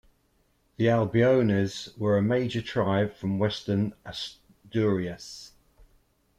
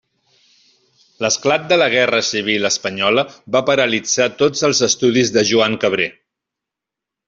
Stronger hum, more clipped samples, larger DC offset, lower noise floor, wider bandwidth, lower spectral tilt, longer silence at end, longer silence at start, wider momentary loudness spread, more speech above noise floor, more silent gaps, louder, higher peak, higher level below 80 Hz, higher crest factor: neither; neither; neither; second, -68 dBFS vs -84 dBFS; first, 12 kHz vs 8 kHz; first, -7 dB/octave vs -2.5 dB/octave; second, 0.9 s vs 1.15 s; second, 0.8 s vs 1.2 s; first, 14 LU vs 5 LU; second, 42 dB vs 68 dB; neither; second, -26 LUFS vs -16 LUFS; second, -12 dBFS vs -2 dBFS; about the same, -58 dBFS vs -60 dBFS; about the same, 16 dB vs 16 dB